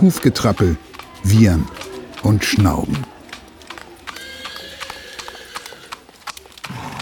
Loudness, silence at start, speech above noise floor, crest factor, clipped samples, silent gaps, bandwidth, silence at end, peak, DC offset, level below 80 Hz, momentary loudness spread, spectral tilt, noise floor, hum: -18 LUFS; 0 s; 24 dB; 18 dB; under 0.1%; none; 19.5 kHz; 0 s; 0 dBFS; under 0.1%; -36 dBFS; 21 LU; -6 dB/octave; -39 dBFS; none